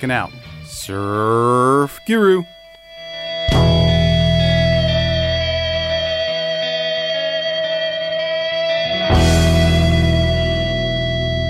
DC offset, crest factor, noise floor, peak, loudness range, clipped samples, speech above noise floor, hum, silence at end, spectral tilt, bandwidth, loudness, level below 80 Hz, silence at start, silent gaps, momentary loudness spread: under 0.1%; 12 dB; -38 dBFS; -4 dBFS; 3 LU; under 0.1%; 21 dB; none; 0 s; -5.5 dB/octave; 15.5 kHz; -16 LUFS; -30 dBFS; 0 s; none; 9 LU